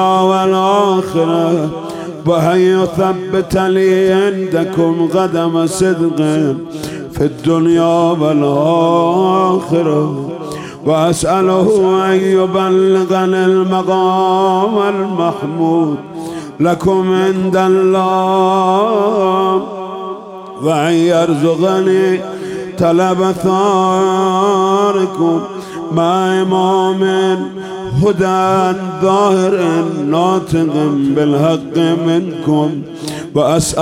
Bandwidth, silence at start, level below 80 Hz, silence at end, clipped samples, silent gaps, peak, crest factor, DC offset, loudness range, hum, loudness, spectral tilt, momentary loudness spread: 15 kHz; 0 s; -46 dBFS; 0 s; under 0.1%; none; 0 dBFS; 12 dB; under 0.1%; 2 LU; none; -13 LUFS; -6 dB/octave; 9 LU